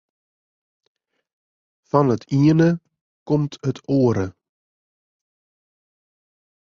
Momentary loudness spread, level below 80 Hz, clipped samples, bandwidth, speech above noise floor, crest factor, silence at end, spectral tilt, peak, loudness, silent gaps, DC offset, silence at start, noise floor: 11 LU; -54 dBFS; under 0.1%; 7.2 kHz; over 72 dB; 20 dB; 2.35 s; -8.5 dB/octave; -4 dBFS; -20 LUFS; 3.01-3.26 s; under 0.1%; 1.95 s; under -90 dBFS